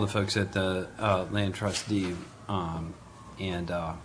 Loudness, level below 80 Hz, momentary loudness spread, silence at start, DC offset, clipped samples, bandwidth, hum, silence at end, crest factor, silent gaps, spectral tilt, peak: -31 LUFS; -52 dBFS; 11 LU; 0 s; under 0.1%; under 0.1%; 11 kHz; none; 0 s; 18 dB; none; -5 dB/octave; -12 dBFS